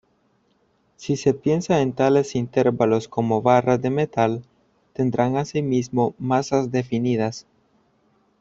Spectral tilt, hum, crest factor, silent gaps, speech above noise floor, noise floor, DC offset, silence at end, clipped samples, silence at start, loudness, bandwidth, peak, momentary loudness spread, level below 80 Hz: -7 dB/octave; none; 20 dB; none; 44 dB; -64 dBFS; under 0.1%; 1 s; under 0.1%; 1 s; -21 LUFS; 7.8 kHz; -2 dBFS; 7 LU; -58 dBFS